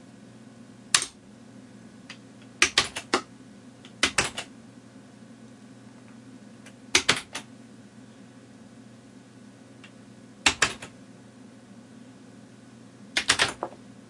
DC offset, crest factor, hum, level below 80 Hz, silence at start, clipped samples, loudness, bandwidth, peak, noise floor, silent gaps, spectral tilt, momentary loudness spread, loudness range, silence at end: under 0.1%; 32 dB; none; -60 dBFS; 0.7 s; under 0.1%; -25 LUFS; 11.5 kHz; 0 dBFS; -49 dBFS; none; -0.5 dB/octave; 27 LU; 5 LU; 0.2 s